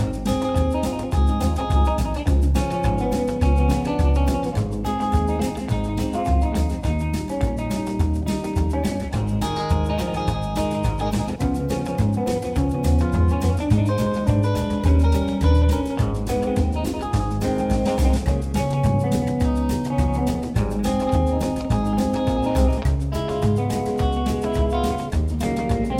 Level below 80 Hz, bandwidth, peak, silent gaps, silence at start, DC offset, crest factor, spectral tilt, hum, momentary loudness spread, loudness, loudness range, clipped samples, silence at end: -24 dBFS; 16 kHz; -6 dBFS; none; 0 s; under 0.1%; 16 dB; -7 dB/octave; none; 4 LU; -22 LUFS; 3 LU; under 0.1%; 0 s